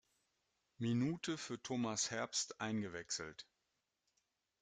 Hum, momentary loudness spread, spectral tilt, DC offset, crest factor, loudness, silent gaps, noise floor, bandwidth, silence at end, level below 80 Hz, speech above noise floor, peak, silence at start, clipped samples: none; 6 LU; -3.5 dB/octave; under 0.1%; 18 dB; -41 LUFS; none; -87 dBFS; 9.6 kHz; 1.2 s; -78 dBFS; 46 dB; -26 dBFS; 0.8 s; under 0.1%